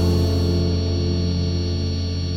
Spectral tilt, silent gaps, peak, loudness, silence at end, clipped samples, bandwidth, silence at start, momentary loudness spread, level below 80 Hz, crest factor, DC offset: -7 dB/octave; none; -8 dBFS; -22 LUFS; 0 s; under 0.1%; 7.6 kHz; 0 s; 4 LU; -32 dBFS; 12 dB; under 0.1%